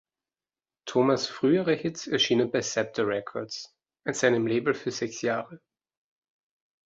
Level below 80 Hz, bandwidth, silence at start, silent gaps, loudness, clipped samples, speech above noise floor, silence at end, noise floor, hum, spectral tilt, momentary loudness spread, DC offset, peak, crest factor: -70 dBFS; 8 kHz; 0.85 s; none; -27 LUFS; under 0.1%; over 64 dB; 1.3 s; under -90 dBFS; none; -4 dB/octave; 13 LU; under 0.1%; -8 dBFS; 20 dB